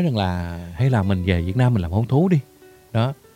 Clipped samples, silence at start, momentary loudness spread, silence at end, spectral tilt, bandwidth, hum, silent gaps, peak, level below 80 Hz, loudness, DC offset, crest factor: under 0.1%; 0 s; 7 LU; 0.2 s; -8.5 dB/octave; 11 kHz; none; none; -4 dBFS; -40 dBFS; -21 LUFS; under 0.1%; 16 dB